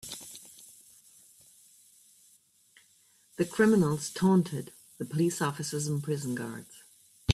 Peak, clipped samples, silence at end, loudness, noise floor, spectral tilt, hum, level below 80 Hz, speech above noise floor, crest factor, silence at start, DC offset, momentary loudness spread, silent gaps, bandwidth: -12 dBFS; under 0.1%; 0 s; -29 LUFS; -64 dBFS; -5.5 dB/octave; none; -68 dBFS; 36 dB; 20 dB; 0.05 s; under 0.1%; 24 LU; none; 15 kHz